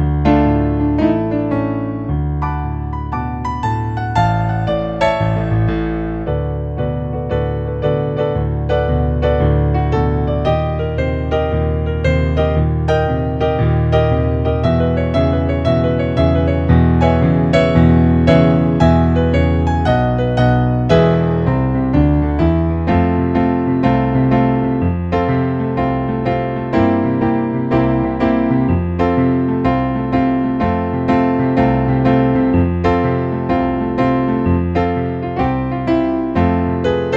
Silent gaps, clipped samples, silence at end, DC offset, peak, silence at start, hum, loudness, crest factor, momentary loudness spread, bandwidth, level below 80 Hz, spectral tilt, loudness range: none; under 0.1%; 0 s; under 0.1%; 0 dBFS; 0 s; none; -16 LUFS; 14 dB; 6 LU; 7.8 kHz; -26 dBFS; -9 dB/octave; 5 LU